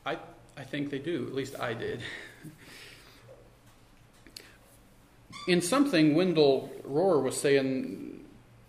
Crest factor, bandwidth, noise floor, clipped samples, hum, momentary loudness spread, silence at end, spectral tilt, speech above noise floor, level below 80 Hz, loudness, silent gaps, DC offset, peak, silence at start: 20 dB; 15.5 kHz; -58 dBFS; under 0.1%; none; 25 LU; 0.4 s; -5 dB/octave; 29 dB; -64 dBFS; -28 LUFS; none; under 0.1%; -12 dBFS; 0.05 s